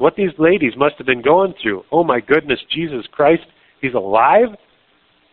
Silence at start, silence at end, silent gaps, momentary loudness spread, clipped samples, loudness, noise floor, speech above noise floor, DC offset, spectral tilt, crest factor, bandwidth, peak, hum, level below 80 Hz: 0 s; 0.8 s; none; 9 LU; under 0.1%; -16 LUFS; -57 dBFS; 42 dB; under 0.1%; -3.5 dB/octave; 16 dB; 4.3 kHz; 0 dBFS; none; -52 dBFS